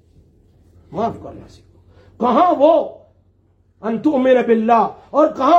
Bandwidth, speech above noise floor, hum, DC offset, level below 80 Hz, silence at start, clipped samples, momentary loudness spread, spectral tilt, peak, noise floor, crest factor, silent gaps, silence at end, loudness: 7.8 kHz; 42 dB; none; under 0.1%; -56 dBFS; 0.9 s; under 0.1%; 16 LU; -7 dB/octave; -2 dBFS; -57 dBFS; 16 dB; none; 0 s; -16 LUFS